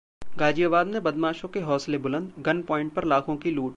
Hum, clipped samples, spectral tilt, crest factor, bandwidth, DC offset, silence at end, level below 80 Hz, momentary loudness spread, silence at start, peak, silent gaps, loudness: none; under 0.1%; -6.5 dB/octave; 16 dB; 9.2 kHz; under 0.1%; 0 s; -56 dBFS; 6 LU; 0.2 s; -10 dBFS; none; -26 LUFS